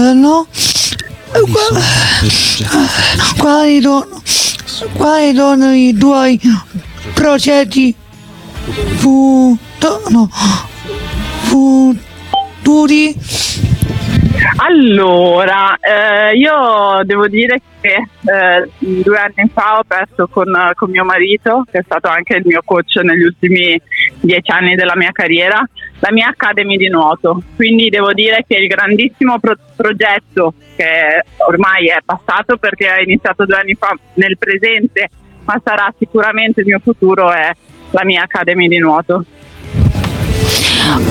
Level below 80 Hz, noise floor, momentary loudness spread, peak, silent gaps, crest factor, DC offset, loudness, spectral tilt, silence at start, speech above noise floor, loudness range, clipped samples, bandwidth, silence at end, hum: -32 dBFS; -33 dBFS; 8 LU; 0 dBFS; none; 10 dB; under 0.1%; -10 LUFS; -4.5 dB/octave; 0 s; 23 dB; 2 LU; under 0.1%; 17 kHz; 0 s; none